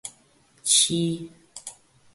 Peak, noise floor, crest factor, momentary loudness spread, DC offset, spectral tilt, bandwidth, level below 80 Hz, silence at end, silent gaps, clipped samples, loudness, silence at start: -6 dBFS; -60 dBFS; 22 dB; 23 LU; under 0.1%; -2.5 dB/octave; 12 kHz; -66 dBFS; 0.4 s; none; under 0.1%; -21 LUFS; 0.05 s